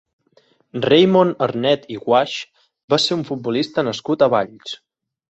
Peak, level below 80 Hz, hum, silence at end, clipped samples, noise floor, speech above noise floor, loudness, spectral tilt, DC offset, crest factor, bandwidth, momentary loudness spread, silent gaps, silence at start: -2 dBFS; -60 dBFS; none; 0.55 s; under 0.1%; -58 dBFS; 40 dB; -18 LUFS; -5.5 dB/octave; under 0.1%; 18 dB; 8.2 kHz; 17 LU; 2.84-2.88 s; 0.75 s